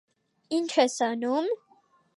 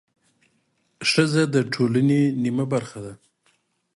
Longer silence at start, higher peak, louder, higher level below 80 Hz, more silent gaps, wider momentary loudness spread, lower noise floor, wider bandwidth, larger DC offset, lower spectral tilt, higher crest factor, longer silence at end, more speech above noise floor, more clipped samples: second, 0.5 s vs 1 s; second, -10 dBFS vs -4 dBFS; second, -27 LUFS vs -21 LUFS; second, -84 dBFS vs -64 dBFS; neither; second, 8 LU vs 14 LU; second, -64 dBFS vs -68 dBFS; about the same, 11.5 kHz vs 11.5 kHz; neither; second, -2.5 dB/octave vs -5.5 dB/octave; about the same, 20 dB vs 20 dB; second, 0.6 s vs 0.8 s; second, 38 dB vs 47 dB; neither